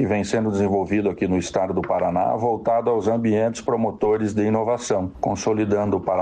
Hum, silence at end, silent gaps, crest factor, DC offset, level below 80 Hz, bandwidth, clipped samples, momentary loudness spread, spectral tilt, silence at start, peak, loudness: none; 0 s; none; 14 dB; under 0.1%; -50 dBFS; 9.6 kHz; under 0.1%; 3 LU; -6.5 dB/octave; 0 s; -8 dBFS; -22 LUFS